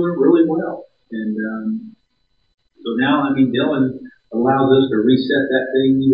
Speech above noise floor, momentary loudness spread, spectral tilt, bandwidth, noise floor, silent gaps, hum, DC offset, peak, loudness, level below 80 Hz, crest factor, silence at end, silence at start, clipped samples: 50 dB; 14 LU; -10.5 dB/octave; 5.2 kHz; -66 dBFS; 2.54-2.58 s; none; under 0.1%; -2 dBFS; -17 LUFS; -62 dBFS; 16 dB; 0 s; 0 s; under 0.1%